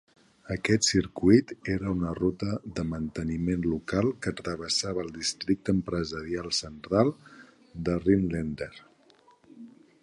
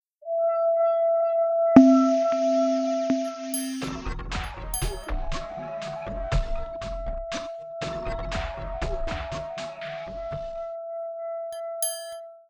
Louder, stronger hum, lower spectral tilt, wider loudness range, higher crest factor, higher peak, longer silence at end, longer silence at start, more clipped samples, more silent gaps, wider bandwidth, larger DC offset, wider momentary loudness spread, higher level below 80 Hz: about the same, -28 LUFS vs -26 LUFS; neither; about the same, -5 dB/octave vs -5.5 dB/octave; second, 3 LU vs 12 LU; about the same, 22 dB vs 24 dB; second, -6 dBFS vs -2 dBFS; first, 0.35 s vs 0.1 s; first, 0.45 s vs 0.2 s; neither; neither; second, 11.5 kHz vs 19.5 kHz; neither; about the same, 11 LU vs 12 LU; second, -48 dBFS vs -36 dBFS